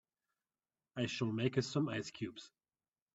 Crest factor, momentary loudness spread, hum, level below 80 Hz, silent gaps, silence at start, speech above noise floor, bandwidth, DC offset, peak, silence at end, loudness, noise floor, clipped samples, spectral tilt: 22 dB; 12 LU; none; -76 dBFS; none; 0.95 s; over 52 dB; 8 kHz; under 0.1%; -20 dBFS; 0.65 s; -39 LUFS; under -90 dBFS; under 0.1%; -5.5 dB/octave